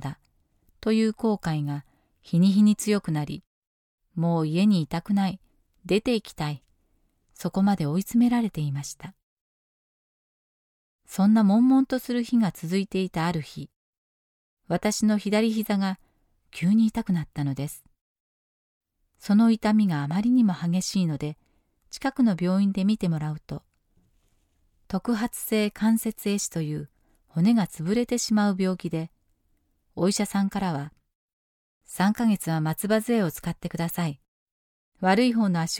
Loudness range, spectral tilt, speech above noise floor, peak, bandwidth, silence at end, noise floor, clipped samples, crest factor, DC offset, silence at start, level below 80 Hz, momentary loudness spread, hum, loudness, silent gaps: 4 LU; -6 dB/octave; 46 dB; -10 dBFS; 17.5 kHz; 0 s; -69 dBFS; under 0.1%; 16 dB; under 0.1%; 0 s; -58 dBFS; 15 LU; none; -25 LUFS; 3.47-3.98 s, 9.23-10.99 s, 13.76-14.57 s, 18.01-18.81 s, 31.15-31.81 s, 34.28-34.92 s